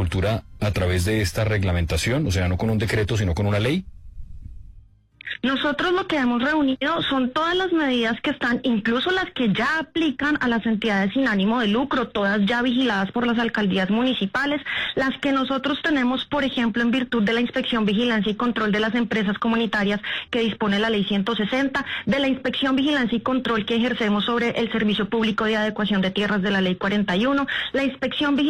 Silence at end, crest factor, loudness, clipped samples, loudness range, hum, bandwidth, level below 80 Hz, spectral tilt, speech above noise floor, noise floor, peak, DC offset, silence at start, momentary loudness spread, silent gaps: 0 s; 10 dB; -22 LUFS; under 0.1%; 2 LU; none; 14.5 kHz; -44 dBFS; -5.5 dB/octave; 27 dB; -49 dBFS; -12 dBFS; under 0.1%; 0 s; 3 LU; none